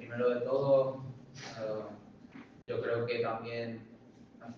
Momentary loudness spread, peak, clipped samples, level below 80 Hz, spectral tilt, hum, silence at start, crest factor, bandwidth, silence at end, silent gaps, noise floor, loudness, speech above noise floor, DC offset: 24 LU; -16 dBFS; under 0.1%; -74 dBFS; -6.5 dB/octave; none; 0 s; 18 dB; 7 kHz; 0 s; none; -56 dBFS; -34 LUFS; 23 dB; under 0.1%